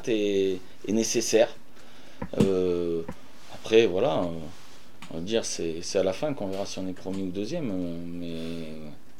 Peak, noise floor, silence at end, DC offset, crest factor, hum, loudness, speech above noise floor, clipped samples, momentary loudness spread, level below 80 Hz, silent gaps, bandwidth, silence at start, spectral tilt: -6 dBFS; -52 dBFS; 0.25 s; 2%; 22 dB; none; -28 LUFS; 25 dB; under 0.1%; 17 LU; -58 dBFS; none; 16 kHz; 0 s; -4.5 dB/octave